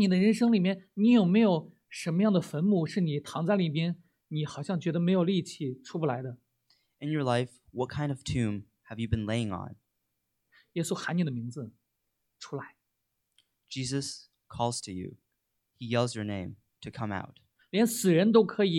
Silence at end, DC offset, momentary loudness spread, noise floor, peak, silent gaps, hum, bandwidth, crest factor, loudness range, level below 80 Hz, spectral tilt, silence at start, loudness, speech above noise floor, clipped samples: 0 s; under 0.1%; 19 LU; -81 dBFS; -10 dBFS; none; none; 15.5 kHz; 20 dB; 11 LU; -60 dBFS; -6 dB/octave; 0 s; -29 LUFS; 53 dB; under 0.1%